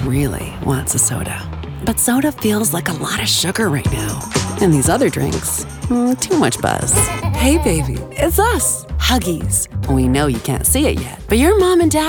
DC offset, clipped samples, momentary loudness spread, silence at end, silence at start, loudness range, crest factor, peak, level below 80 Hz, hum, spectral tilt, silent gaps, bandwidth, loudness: under 0.1%; under 0.1%; 7 LU; 0 s; 0 s; 2 LU; 14 dB; -2 dBFS; -28 dBFS; none; -4 dB/octave; none; 19.5 kHz; -16 LUFS